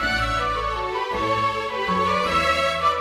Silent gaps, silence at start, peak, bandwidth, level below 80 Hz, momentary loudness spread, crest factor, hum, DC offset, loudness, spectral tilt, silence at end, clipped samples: none; 0 s; -6 dBFS; 15.5 kHz; -38 dBFS; 5 LU; 16 dB; none; under 0.1%; -22 LUFS; -4 dB/octave; 0 s; under 0.1%